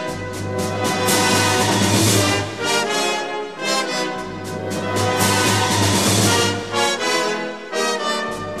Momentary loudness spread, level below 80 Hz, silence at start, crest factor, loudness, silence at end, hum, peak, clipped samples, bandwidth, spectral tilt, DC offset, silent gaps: 11 LU; -50 dBFS; 0 s; 16 dB; -18 LUFS; 0 s; none; -2 dBFS; under 0.1%; 14 kHz; -3 dB/octave; 0.4%; none